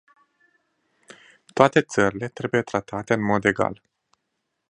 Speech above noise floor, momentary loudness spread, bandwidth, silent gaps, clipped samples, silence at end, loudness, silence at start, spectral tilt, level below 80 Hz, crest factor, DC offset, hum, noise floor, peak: 56 dB; 11 LU; 10.5 kHz; none; under 0.1%; 0.95 s; -22 LUFS; 1.55 s; -5.5 dB/octave; -58 dBFS; 24 dB; under 0.1%; none; -78 dBFS; 0 dBFS